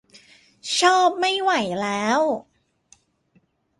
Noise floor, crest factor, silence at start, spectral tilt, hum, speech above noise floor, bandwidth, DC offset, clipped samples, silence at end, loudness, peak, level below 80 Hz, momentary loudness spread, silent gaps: -63 dBFS; 20 dB; 0.65 s; -2.5 dB/octave; none; 43 dB; 11.5 kHz; under 0.1%; under 0.1%; 1.4 s; -20 LUFS; -2 dBFS; -68 dBFS; 8 LU; none